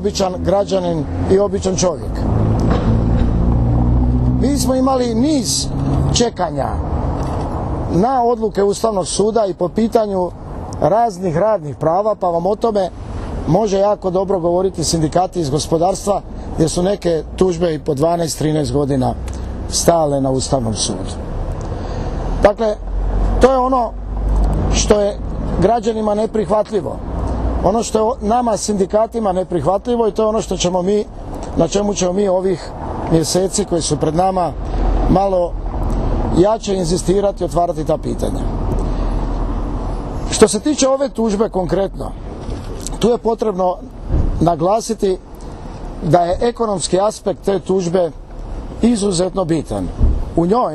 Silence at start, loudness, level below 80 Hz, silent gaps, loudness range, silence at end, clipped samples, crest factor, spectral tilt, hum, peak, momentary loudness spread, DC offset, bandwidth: 0 s; -17 LUFS; -24 dBFS; none; 2 LU; 0 s; under 0.1%; 16 dB; -5.5 dB/octave; none; 0 dBFS; 9 LU; under 0.1%; 13.5 kHz